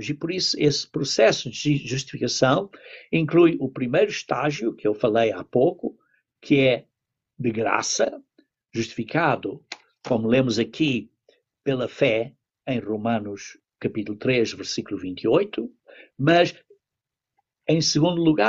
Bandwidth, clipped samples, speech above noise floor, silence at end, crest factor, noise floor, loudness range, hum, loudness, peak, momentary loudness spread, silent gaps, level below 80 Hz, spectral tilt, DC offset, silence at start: 8 kHz; under 0.1%; 64 dB; 0 s; 18 dB; -87 dBFS; 4 LU; none; -23 LUFS; -6 dBFS; 14 LU; none; -60 dBFS; -5 dB/octave; under 0.1%; 0 s